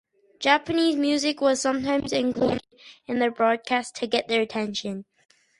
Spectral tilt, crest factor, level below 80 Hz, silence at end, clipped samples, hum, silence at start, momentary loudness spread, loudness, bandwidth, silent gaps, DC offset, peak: -3.5 dB/octave; 20 dB; -60 dBFS; 0.6 s; under 0.1%; none; 0.4 s; 9 LU; -24 LUFS; 11.5 kHz; none; under 0.1%; -6 dBFS